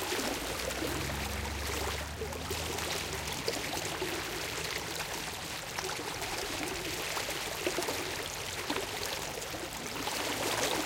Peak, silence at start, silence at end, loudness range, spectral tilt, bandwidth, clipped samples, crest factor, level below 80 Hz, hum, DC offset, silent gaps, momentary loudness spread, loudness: -16 dBFS; 0 s; 0 s; 1 LU; -2.5 dB/octave; 17 kHz; under 0.1%; 20 dB; -50 dBFS; none; under 0.1%; none; 4 LU; -35 LUFS